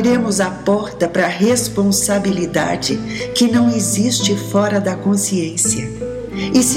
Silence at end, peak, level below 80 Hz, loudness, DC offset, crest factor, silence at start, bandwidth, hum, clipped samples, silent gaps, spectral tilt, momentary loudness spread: 0 s; -2 dBFS; -44 dBFS; -16 LUFS; under 0.1%; 14 dB; 0 s; 16.5 kHz; none; under 0.1%; none; -4 dB/octave; 6 LU